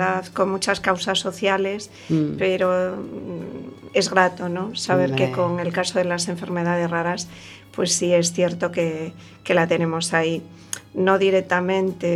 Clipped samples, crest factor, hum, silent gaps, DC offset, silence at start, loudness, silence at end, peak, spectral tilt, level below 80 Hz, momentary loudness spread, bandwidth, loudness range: under 0.1%; 22 dB; none; none; under 0.1%; 0 s; -22 LUFS; 0 s; 0 dBFS; -4.5 dB/octave; -60 dBFS; 13 LU; 14 kHz; 1 LU